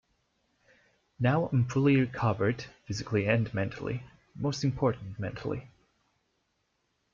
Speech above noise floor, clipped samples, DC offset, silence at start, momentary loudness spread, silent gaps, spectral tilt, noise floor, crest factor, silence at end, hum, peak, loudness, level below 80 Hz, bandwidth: 48 dB; under 0.1%; under 0.1%; 1.2 s; 12 LU; none; -7 dB/octave; -77 dBFS; 18 dB; 1.45 s; none; -12 dBFS; -30 LUFS; -58 dBFS; 7.4 kHz